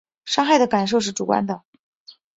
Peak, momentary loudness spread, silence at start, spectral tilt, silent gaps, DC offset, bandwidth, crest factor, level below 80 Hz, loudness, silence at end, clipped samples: -4 dBFS; 10 LU; 0.25 s; -4 dB/octave; 1.65-1.73 s, 1.80-2.06 s; under 0.1%; 8 kHz; 18 dB; -64 dBFS; -20 LUFS; 0.25 s; under 0.1%